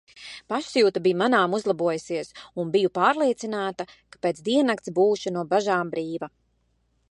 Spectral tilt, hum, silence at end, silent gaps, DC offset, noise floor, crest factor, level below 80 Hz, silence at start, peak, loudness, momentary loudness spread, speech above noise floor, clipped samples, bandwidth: -5 dB/octave; none; 0.85 s; none; under 0.1%; -69 dBFS; 20 dB; -68 dBFS; 0.15 s; -6 dBFS; -24 LUFS; 14 LU; 45 dB; under 0.1%; 11 kHz